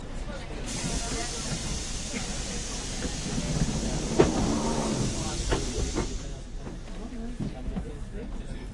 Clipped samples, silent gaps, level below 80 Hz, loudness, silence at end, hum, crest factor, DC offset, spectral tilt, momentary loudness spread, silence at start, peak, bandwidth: under 0.1%; none; -36 dBFS; -31 LUFS; 0 s; none; 24 dB; under 0.1%; -4.5 dB/octave; 12 LU; 0 s; -6 dBFS; 11.5 kHz